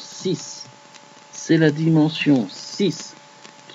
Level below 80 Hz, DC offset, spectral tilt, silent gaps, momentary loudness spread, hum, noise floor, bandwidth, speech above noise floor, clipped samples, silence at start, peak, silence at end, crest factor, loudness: -70 dBFS; under 0.1%; -5.5 dB/octave; none; 20 LU; none; -46 dBFS; 8 kHz; 27 dB; under 0.1%; 0 s; -4 dBFS; 0 s; 18 dB; -20 LUFS